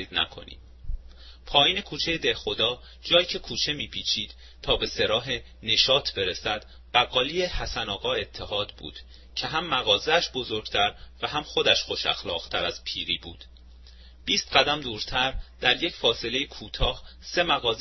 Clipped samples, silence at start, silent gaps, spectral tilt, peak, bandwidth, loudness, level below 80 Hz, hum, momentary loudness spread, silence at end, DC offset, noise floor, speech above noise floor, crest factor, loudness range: under 0.1%; 0 s; none; -2.5 dB/octave; -2 dBFS; 6.2 kHz; -25 LUFS; -42 dBFS; none; 13 LU; 0 s; under 0.1%; -48 dBFS; 21 dB; 24 dB; 3 LU